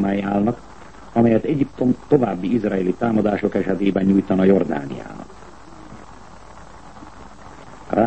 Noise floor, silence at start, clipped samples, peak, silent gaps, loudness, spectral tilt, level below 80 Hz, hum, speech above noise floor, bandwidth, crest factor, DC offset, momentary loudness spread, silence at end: -42 dBFS; 0 s; under 0.1%; -2 dBFS; none; -19 LUFS; -8.5 dB/octave; -48 dBFS; none; 23 dB; 8.6 kHz; 18 dB; 0.7%; 24 LU; 0 s